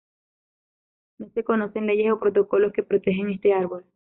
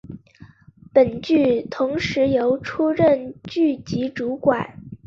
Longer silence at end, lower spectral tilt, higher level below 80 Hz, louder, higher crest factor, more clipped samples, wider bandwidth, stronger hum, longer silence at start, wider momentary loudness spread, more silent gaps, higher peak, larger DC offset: first, 0.25 s vs 0.1 s; about the same, -6 dB/octave vs -7 dB/octave; second, -64 dBFS vs -52 dBFS; second, -23 LUFS vs -20 LUFS; about the same, 14 dB vs 18 dB; neither; second, 3.9 kHz vs 7.4 kHz; neither; first, 1.2 s vs 0.05 s; about the same, 9 LU vs 8 LU; neither; second, -10 dBFS vs -2 dBFS; neither